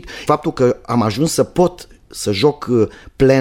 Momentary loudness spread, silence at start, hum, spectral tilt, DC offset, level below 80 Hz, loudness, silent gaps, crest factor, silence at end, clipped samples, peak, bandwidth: 6 LU; 0.05 s; none; -5.5 dB/octave; under 0.1%; -40 dBFS; -17 LUFS; none; 14 dB; 0 s; under 0.1%; -2 dBFS; 16.5 kHz